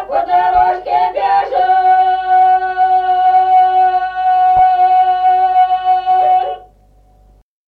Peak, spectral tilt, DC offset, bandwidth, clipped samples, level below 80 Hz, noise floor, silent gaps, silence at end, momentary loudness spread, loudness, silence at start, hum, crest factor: -2 dBFS; -5 dB/octave; under 0.1%; 4.7 kHz; under 0.1%; -46 dBFS; -48 dBFS; none; 1.1 s; 4 LU; -12 LUFS; 0 s; none; 10 dB